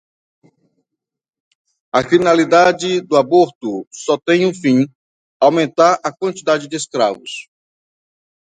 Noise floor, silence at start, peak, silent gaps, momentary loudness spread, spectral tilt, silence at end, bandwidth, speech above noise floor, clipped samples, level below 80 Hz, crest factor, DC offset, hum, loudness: -82 dBFS; 1.95 s; 0 dBFS; 3.55-3.61 s, 3.87-3.91 s, 4.95-5.40 s; 12 LU; -5 dB/octave; 1.05 s; 9.4 kHz; 67 dB; under 0.1%; -62 dBFS; 16 dB; under 0.1%; none; -15 LUFS